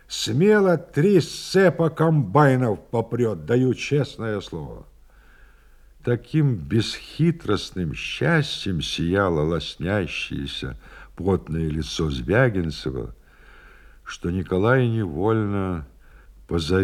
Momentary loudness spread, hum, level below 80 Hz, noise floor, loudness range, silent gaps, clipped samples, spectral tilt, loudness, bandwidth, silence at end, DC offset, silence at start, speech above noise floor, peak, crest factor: 12 LU; none; -44 dBFS; -51 dBFS; 6 LU; none; under 0.1%; -6.5 dB/octave; -22 LUFS; 13.5 kHz; 0 s; under 0.1%; 0.1 s; 29 dB; -4 dBFS; 20 dB